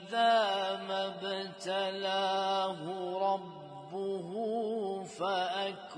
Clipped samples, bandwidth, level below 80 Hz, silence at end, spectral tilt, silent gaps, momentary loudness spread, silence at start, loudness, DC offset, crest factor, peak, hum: under 0.1%; 10.5 kHz; -84 dBFS; 0 s; -4 dB/octave; none; 10 LU; 0 s; -33 LUFS; under 0.1%; 16 dB; -18 dBFS; none